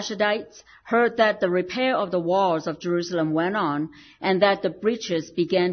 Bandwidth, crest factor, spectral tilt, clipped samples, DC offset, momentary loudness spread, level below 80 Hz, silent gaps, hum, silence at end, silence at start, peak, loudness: 6.6 kHz; 16 dB; -5.5 dB/octave; under 0.1%; under 0.1%; 7 LU; -64 dBFS; none; none; 0 s; 0 s; -6 dBFS; -23 LUFS